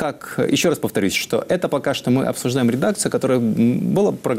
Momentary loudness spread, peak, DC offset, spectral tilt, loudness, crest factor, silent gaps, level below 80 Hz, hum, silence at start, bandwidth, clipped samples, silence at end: 3 LU; -8 dBFS; under 0.1%; -5 dB/octave; -19 LUFS; 12 dB; none; -56 dBFS; none; 0 s; 16 kHz; under 0.1%; 0 s